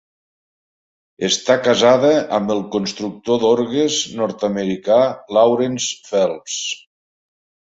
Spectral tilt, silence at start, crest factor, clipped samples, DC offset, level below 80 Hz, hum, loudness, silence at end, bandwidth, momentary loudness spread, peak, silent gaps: -3.5 dB/octave; 1.2 s; 18 dB; under 0.1%; under 0.1%; -60 dBFS; none; -17 LUFS; 1 s; 8 kHz; 10 LU; 0 dBFS; none